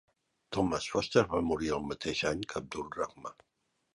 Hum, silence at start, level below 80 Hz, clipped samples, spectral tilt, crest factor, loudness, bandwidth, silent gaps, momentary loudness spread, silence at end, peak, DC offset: none; 0.5 s; -56 dBFS; under 0.1%; -4.5 dB/octave; 24 dB; -33 LUFS; 11.5 kHz; none; 11 LU; 0.65 s; -10 dBFS; under 0.1%